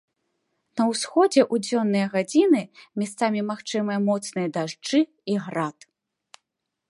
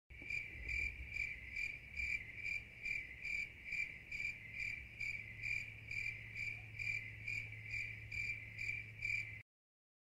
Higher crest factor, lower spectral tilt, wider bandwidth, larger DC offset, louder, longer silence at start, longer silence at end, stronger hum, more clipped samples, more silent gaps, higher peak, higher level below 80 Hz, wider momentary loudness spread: about the same, 18 dB vs 16 dB; first, -5 dB/octave vs -3 dB/octave; second, 11.5 kHz vs 16 kHz; neither; first, -24 LUFS vs -43 LUFS; first, 0.75 s vs 0.1 s; first, 1.2 s vs 0.6 s; neither; neither; neither; first, -6 dBFS vs -30 dBFS; second, -76 dBFS vs -60 dBFS; first, 10 LU vs 3 LU